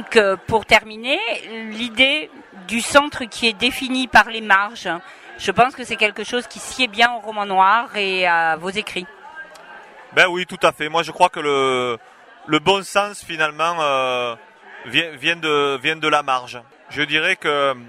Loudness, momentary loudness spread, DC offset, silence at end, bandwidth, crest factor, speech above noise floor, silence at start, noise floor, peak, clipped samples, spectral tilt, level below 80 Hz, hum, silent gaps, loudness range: -18 LUFS; 14 LU; under 0.1%; 0 s; 16 kHz; 20 dB; 22 dB; 0 s; -41 dBFS; 0 dBFS; under 0.1%; -3 dB/octave; -52 dBFS; none; none; 2 LU